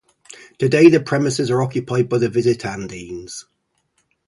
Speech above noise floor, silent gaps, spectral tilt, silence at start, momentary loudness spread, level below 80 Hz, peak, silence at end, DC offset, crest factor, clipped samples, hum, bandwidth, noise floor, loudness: 50 dB; none; -6 dB/octave; 0.3 s; 19 LU; -54 dBFS; 0 dBFS; 0.85 s; under 0.1%; 18 dB; under 0.1%; none; 11.5 kHz; -67 dBFS; -17 LUFS